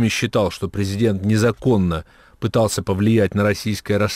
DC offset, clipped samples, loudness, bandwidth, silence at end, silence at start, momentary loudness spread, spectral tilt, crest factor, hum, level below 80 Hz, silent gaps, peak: under 0.1%; under 0.1%; -19 LUFS; 16 kHz; 0 s; 0 s; 7 LU; -6 dB/octave; 12 dB; none; -44 dBFS; none; -8 dBFS